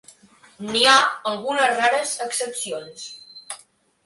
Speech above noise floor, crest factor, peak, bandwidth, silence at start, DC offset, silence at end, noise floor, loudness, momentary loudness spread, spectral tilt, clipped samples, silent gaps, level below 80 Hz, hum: 33 dB; 22 dB; 0 dBFS; 12 kHz; 0.6 s; under 0.1%; 0.5 s; -54 dBFS; -19 LUFS; 22 LU; -0.5 dB/octave; under 0.1%; none; -66 dBFS; none